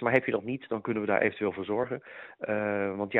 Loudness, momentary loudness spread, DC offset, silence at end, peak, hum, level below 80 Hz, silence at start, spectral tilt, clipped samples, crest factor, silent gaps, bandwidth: -30 LUFS; 10 LU; under 0.1%; 0 s; -8 dBFS; none; -70 dBFS; 0 s; -5 dB/octave; under 0.1%; 20 dB; none; 4.2 kHz